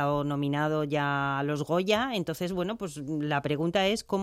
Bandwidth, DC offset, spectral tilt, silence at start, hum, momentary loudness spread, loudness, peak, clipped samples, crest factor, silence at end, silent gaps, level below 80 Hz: 15.5 kHz; under 0.1%; -5.5 dB/octave; 0 s; none; 6 LU; -29 LUFS; -12 dBFS; under 0.1%; 16 dB; 0 s; none; -58 dBFS